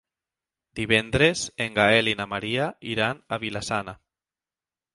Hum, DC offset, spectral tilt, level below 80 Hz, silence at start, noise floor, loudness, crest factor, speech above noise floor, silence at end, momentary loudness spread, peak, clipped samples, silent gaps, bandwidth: none; under 0.1%; -4 dB/octave; -52 dBFS; 0.75 s; under -90 dBFS; -24 LUFS; 22 dB; over 66 dB; 1 s; 11 LU; -4 dBFS; under 0.1%; none; 11.5 kHz